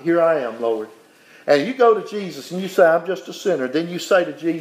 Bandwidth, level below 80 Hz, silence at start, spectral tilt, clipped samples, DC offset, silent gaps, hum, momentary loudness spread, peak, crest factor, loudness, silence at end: 15.5 kHz; -80 dBFS; 0 s; -5 dB/octave; under 0.1%; under 0.1%; none; none; 13 LU; -2 dBFS; 18 dB; -19 LUFS; 0 s